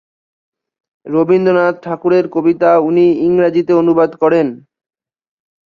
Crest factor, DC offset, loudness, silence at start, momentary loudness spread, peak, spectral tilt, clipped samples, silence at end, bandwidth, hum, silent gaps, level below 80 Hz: 12 dB; under 0.1%; -13 LUFS; 1.05 s; 6 LU; -2 dBFS; -9 dB/octave; under 0.1%; 1.1 s; 6 kHz; none; none; -58 dBFS